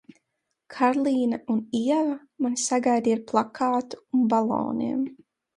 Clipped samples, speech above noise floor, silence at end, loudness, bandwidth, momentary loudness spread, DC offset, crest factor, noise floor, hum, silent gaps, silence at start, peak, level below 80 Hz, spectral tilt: under 0.1%; 55 dB; 0.45 s; -25 LUFS; 11.5 kHz; 6 LU; under 0.1%; 18 dB; -80 dBFS; none; none; 0.7 s; -8 dBFS; -68 dBFS; -4.5 dB/octave